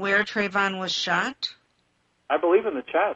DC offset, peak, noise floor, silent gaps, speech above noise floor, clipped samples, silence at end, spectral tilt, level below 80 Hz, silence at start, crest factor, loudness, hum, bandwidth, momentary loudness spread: under 0.1%; -8 dBFS; -69 dBFS; none; 45 dB; under 0.1%; 0 s; -3.5 dB/octave; -66 dBFS; 0 s; 16 dB; -24 LUFS; none; 8 kHz; 7 LU